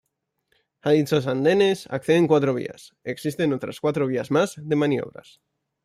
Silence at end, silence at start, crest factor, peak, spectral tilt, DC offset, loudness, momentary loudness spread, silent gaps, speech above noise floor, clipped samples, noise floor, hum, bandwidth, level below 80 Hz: 0.75 s; 0.85 s; 16 dB; -6 dBFS; -6.5 dB/octave; under 0.1%; -22 LUFS; 11 LU; none; 50 dB; under 0.1%; -72 dBFS; none; 15 kHz; -66 dBFS